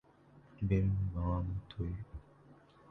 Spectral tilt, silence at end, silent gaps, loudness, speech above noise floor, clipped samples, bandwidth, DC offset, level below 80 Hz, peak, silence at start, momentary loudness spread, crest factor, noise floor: -10 dB/octave; 0.35 s; none; -37 LUFS; 28 dB; under 0.1%; 4.2 kHz; under 0.1%; -46 dBFS; -18 dBFS; 0.35 s; 15 LU; 18 dB; -62 dBFS